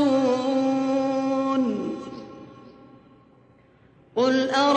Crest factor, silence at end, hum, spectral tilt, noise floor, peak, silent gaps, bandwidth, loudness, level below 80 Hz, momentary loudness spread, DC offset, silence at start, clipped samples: 16 dB; 0 s; none; -5 dB/octave; -56 dBFS; -8 dBFS; none; 8.6 kHz; -24 LUFS; -66 dBFS; 18 LU; under 0.1%; 0 s; under 0.1%